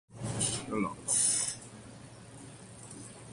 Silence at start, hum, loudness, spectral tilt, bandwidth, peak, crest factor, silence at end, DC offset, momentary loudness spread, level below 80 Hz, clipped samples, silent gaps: 0.1 s; none; -30 LUFS; -2.5 dB/octave; 11.5 kHz; -14 dBFS; 22 dB; 0 s; under 0.1%; 23 LU; -62 dBFS; under 0.1%; none